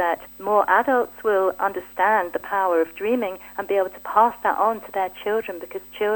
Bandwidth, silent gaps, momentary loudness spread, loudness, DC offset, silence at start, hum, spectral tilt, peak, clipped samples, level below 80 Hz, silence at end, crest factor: 18 kHz; none; 9 LU; -22 LUFS; under 0.1%; 0 s; none; -4.5 dB/octave; -2 dBFS; under 0.1%; -60 dBFS; 0 s; 20 dB